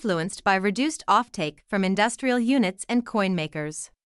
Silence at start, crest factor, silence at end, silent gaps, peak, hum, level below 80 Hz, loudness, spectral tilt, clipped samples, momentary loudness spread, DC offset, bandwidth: 0 s; 16 dB; 0.2 s; none; -8 dBFS; none; -60 dBFS; -24 LUFS; -4.5 dB/octave; under 0.1%; 8 LU; under 0.1%; 12 kHz